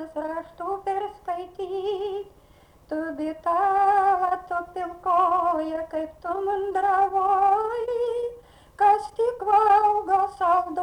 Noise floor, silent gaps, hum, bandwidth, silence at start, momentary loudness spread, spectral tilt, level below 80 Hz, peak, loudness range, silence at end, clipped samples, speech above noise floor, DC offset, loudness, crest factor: -54 dBFS; none; none; 10.5 kHz; 0 s; 12 LU; -5 dB/octave; -58 dBFS; -10 dBFS; 6 LU; 0 s; under 0.1%; 31 dB; under 0.1%; -24 LUFS; 14 dB